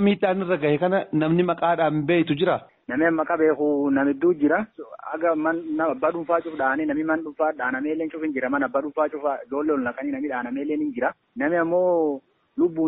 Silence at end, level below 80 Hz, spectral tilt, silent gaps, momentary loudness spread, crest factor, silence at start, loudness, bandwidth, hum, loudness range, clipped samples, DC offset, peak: 0 s; -64 dBFS; -5.5 dB/octave; none; 7 LU; 14 dB; 0 s; -23 LUFS; 4.1 kHz; none; 4 LU; under 0.1%; under 0.1%; -8 dBFS